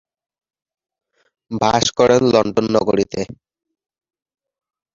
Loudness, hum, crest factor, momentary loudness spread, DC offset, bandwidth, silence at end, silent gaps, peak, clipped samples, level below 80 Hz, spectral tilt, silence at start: -16 LUFS; none; 18 dB; 13 LU; under 0.1%; 7.8 kHz; 1.6 s; none; -2 dBFS; under 0.1%; -50 dBFS; -4.5 dB/octave; 1.5 s